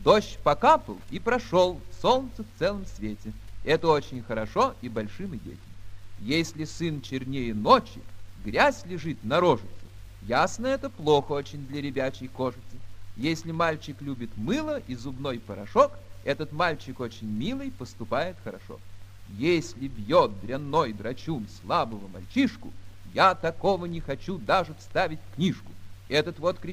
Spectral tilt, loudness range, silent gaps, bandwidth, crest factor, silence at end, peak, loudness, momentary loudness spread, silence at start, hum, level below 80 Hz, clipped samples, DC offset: -5.5 dB/octave; 5 LU; none; 15.5 kHz; 22 dB; 0 s; -4 dBFS; -27 LUFS; 16 LU; 0 s; none; -48 dBFS; under 0.1%; under 0.1%